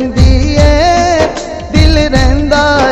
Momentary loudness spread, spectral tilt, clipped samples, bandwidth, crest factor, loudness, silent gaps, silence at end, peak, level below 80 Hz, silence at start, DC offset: 5 LU; -5.5 dB/octave; 1%; 9.4 kHz; 8 dB; -9 LUFS; none; 0 s; 0 dBFS; -12 dBFS; 0 s; under 0.1%